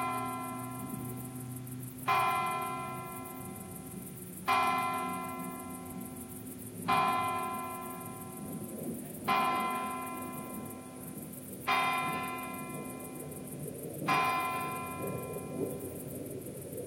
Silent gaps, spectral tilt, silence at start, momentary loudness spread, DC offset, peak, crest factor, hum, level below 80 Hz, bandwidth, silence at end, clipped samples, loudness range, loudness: none; -4 dB/octave; 0 s; 14 LU; under 0.1%; -16 dBFS; 20 dB; none; -68 dBFS; 16.5 kHz; 0 s; under 0.1%; 2 LU; -36 LUFS